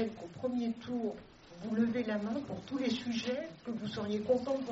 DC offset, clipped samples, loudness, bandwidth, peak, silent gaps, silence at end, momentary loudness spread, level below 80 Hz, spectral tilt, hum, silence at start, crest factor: under 0.1%; under 0.1%; -36 LUFS; 7.6 kHz; -18 dBFS; none; 0 s; 8 LU; -68 dBFS; -5 dB/octave; none; 0 s; 16 dB